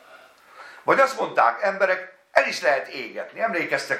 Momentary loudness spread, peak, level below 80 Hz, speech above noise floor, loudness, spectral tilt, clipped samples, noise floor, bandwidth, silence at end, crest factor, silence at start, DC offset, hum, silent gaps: 11 LU; 0 dBFS; -78 dBFS; 27 dB; -22 LUFS; -3 dB/octave; under 0.1%; -50 dBFS; 14.5 kHz; 0 s; 24 dB; 0.1 s; under 0.1%; none; none